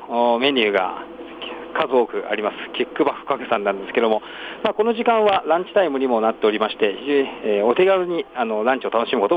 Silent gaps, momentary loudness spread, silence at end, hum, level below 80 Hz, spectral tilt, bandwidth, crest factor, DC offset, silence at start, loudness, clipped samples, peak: none; 9 LU; 0 s; none; -62 dBFS; -6.5 dB/octave; 5 kHz; 16 dB; under 0.1%; 0 s; -20 LUFS; under 0.1%; -4 dBFS